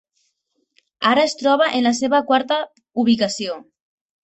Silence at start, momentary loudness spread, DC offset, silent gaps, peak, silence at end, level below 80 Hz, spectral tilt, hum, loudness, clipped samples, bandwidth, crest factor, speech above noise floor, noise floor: 1 s; 10 LU; under 0.1%; none; -2 dBFS; 0.65 s; -64 dBFS; -3.5 dB/octave; none; -19 LUFS; under 0.1%; 8.2 kHz; 18 dB; 53 dB; -70 dBFS